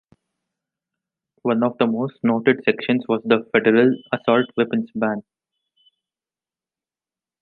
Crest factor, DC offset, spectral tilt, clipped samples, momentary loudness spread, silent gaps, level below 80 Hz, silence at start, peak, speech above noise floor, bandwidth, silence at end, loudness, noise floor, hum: 20 dB; under 0.1%; -9.5 dB/octave; under 0.1%; 7 LU; none; -68 dBFS; 1.45 s; -2 dBFS; over 71 dB; 4.4 kHz; 2.2 s; -20 LUFS; under -90 dBFS; none